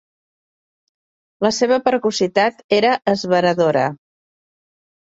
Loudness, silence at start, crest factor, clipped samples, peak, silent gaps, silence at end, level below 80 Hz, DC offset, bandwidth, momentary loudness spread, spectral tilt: -17 LUFS; 1.4 s; 18 dB; under 0.1%; -2 dBFS; 2.64-2.69 s; 1.2 s; -62 dBFS; under 0.1%; 8 kHz; 4 LU; -4.5 dB/octave